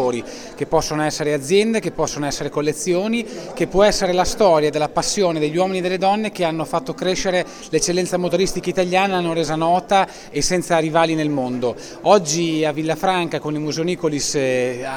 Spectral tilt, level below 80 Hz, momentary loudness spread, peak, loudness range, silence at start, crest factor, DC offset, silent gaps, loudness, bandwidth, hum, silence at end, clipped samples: -4 dB/octave; -42 dBFS; 7 LU; 0 dBFS; 2 LU; 0 s; 18 dB; under 0.1%; none; -19 LUFS; 18 kHz; none; 0 s; under 0.1%